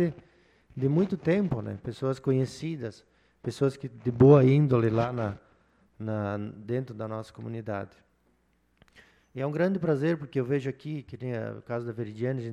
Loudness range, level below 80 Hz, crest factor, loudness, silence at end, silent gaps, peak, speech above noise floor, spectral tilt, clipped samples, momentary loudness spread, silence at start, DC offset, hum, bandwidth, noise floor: 11 LU; -60 dBFS; 22 dB; -28 LUFS; 0 s; none; -6 dBFS; 42 dB; -9 dB/octave; under 0.1%; 16 LU; 0 s; under 0.1%; none; 10 kHz; -69 dBFS